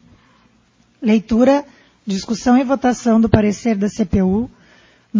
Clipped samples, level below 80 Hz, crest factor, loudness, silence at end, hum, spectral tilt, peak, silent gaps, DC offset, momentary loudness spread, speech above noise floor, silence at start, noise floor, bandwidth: under 0.1%; -38 dBFS; 18 dB; -16 LUFS; 0 s; none; -6.5 dB/octave; 0 dBFS; none; under 0.1%; 10 LU; 41 dB; 1 s; -56 dBFS; 7.6 kHz